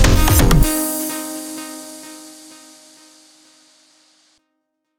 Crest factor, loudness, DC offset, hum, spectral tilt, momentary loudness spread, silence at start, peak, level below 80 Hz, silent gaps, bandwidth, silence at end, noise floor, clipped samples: 18 dB; -17 LUFS; under 0.1%; none; -4.5 dB/octave; 25 LU; 0 s; 0 dBFS; -22 dBFS; none; 19 kHz; 2.7 s; -73 dBFS; under 0.1%